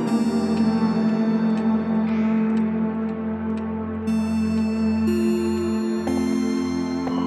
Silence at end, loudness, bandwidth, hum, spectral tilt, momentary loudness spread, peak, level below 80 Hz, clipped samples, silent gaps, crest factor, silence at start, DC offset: 0 s; -22 LUFS; 12 kHz; none; -7 dB/octave; 6 LU; -10 dBFS; -50 dBFS; under 0.1%; none; 12 dB; 0 s; under 0.1%